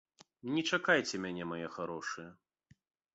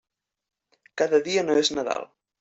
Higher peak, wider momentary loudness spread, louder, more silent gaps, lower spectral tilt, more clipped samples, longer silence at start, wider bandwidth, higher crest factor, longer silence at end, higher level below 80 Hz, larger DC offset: second, -12 dBFS vs -8 dBFS; about the same, 16 LU vs 16 LU; second, -35 LUFS vs -24 LUFS; neither; about the same, -2.5 dB/octave vs -3 dB/octave; neither; second, 0.45 s vs 0.95 s; about the same, 8 kHz vs 8.2 kHz; first, 24 dB vs 18 dB; first, 0.8 s vs 0.35 s; second, -74 dBFS vs -66 dBFS; neither